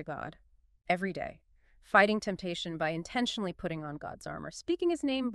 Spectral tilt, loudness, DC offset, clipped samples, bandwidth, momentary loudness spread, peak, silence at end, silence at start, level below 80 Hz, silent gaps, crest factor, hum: -5 dB/octave; -32 LUFS; under 0.1%; under 0.1%; 12 kHz; 16 LU; -10 dBFS; 0 s; 0 s; -60 dBFS; none; 24 dB; none